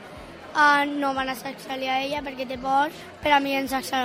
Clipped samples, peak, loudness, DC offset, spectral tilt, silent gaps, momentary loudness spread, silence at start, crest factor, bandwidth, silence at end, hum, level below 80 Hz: under 0.1%; -6 dBFS; -24 LUFS; under 0.1%; -3 dB/octave; none; 14 LU; 0 s; 20 dB; 16 kHz; 0 s; none; -54 dBFS